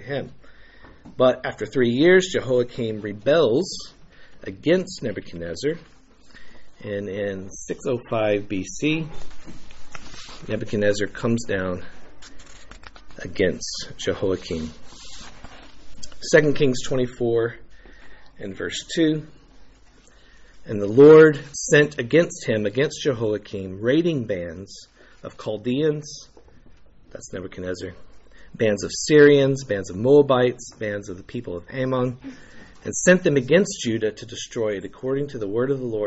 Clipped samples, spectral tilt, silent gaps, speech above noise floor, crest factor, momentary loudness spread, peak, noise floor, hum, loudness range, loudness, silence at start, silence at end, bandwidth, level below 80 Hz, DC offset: under 0.1%; -5 dB/octave; none; 30 dB; 20 dB; 22 LU; -2 dBFS; -51 dBFS; none; 11 LU; -21 LUFS; 0 s; 0 s; 8 kHz; -50 dBFS; under 0.1%